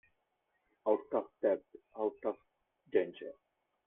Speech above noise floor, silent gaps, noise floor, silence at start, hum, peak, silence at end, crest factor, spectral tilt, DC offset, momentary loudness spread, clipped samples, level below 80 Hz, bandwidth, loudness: 45 dB; none; -81 dBFS; 0.85 s; none; -18 dBFS; 0.55 s; 20 dB; -8.5 dB/octave; under 0.1%; 15 LU; under 0.1%; -82 dBFS; 3.8 kHz; -36 LUFS